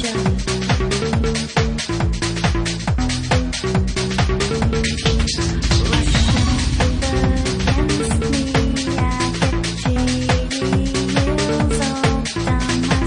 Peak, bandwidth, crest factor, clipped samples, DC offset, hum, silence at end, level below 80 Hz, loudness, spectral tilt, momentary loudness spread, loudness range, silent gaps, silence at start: -4 dBFS; 10.5 kHz; 14 dB; under 0.1%; under 0.1%; none; 0 s; -24 dBFS; -19 LUFS; -5 dB/octave; 3 LU; 2 LU; none; 0 s